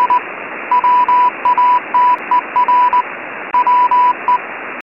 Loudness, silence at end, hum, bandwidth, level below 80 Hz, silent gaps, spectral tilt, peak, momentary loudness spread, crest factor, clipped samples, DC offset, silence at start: -13 LUFS; 0 s; none; 5.2 kHz; -62 dBFS; none; -5 dB/octave; -2 dBFS; 10 LU; 10 dB; under 0.1%; under 0.1%; 0 s